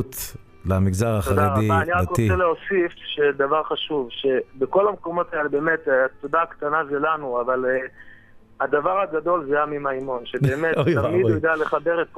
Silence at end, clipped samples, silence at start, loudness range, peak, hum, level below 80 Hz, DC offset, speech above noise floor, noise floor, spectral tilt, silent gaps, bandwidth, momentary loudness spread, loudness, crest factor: 0 s; under 0.1%; 0 s; 3 LU; -6 dBFS; none; -46 dBFS; under 0.1%; 26 dB; -47 dBFS; -6 dB/octave; none; 15.5 kHz; 6 LU; -22 LUFS; 16 dB